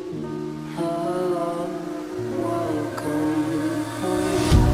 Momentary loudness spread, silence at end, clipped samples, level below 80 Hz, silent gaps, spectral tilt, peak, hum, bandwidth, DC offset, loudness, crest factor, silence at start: 8 LU; 0 s; under 0.1%; -34 dBFS; none; -6.5 dB/octave; -4 dBFS; none; 16 kHz; under 0.1%; -25 LUFS; 18 dB; 0 s